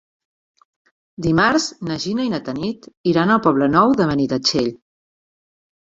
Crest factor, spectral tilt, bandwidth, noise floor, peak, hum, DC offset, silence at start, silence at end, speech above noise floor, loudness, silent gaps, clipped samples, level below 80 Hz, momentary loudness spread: 18 dB; -5 dB/octave; 8 kHz; under -90 dBFS; -2 dBFS; none; under 0.1%; 1.2 s; 1.2 s; over 72 dB; -18 LUFS; 2.97-3.04 s; under 0.1%; -50 dBFS; 10 LU